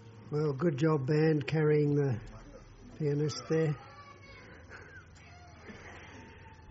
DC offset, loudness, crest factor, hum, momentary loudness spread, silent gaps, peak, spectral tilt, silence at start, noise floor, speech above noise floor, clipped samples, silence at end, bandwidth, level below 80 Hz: under 0.1%; -31 LUFS; 16 dB; none; 24 LU; none; -16 dBFS; -7.5 dB/octave; 0 s; -53 dBFS; 24 dB; under 0.1%; 0 s; 7.6 kHz; -60 dBFS